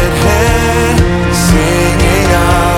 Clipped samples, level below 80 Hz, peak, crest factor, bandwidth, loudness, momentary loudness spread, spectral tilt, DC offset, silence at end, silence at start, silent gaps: under 0.1%; -16 dBFS; 0 dBFS; 10 dB; 17 kHz; -10 LUFS; 1 LU; -5 dB/octave; under 0.1%; 0 s; 0 s; none